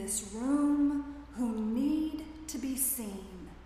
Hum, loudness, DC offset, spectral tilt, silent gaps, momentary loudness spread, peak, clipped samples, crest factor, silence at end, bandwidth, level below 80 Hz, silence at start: none; -32 LUFS; under 0.1%; -4 dB/octave; none; 13 LU; -18 dBFS; under 0.1%; 14 dB; 0 s; 15.5 kHz; -54 dBFS; 0 s